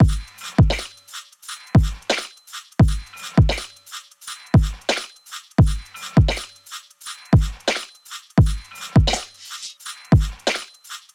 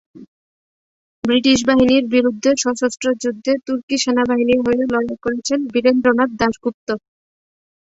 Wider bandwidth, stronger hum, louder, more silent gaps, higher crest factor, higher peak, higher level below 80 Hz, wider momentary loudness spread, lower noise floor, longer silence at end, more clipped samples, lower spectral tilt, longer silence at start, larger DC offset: first, 15.5 kHz vs 8 kHz; neither; second, -21 LUFS vs -17 LUFS; second, none vs 0.28-1.22 s, 3.83-3.88 s, 6.74-6.87 s; about the same, 18 dB vs 16 dB; about the same, -2 dBFS vs -2 dBFS; first, -28 dBFS vs -50 dBFS; first, 17 LU vs 9 LU; second, -40 dBFS vs under -90 dBFS; second, 0.15 s vs 0.85 s; neither; first, -5.5 dB/octave vs -3.5 dB/octave; second, 0 s vs 0.15 s; neither